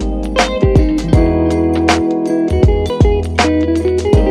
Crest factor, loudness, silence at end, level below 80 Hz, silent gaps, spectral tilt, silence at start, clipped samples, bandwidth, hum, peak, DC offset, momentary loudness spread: 12 dB; -13 LUFS; 0 s; -18 dBFS; none; -6.5 dB/octave; 0 s; under 0.1%; 12 kHz; none; 0 dBFS; under 0.1%; 3 LU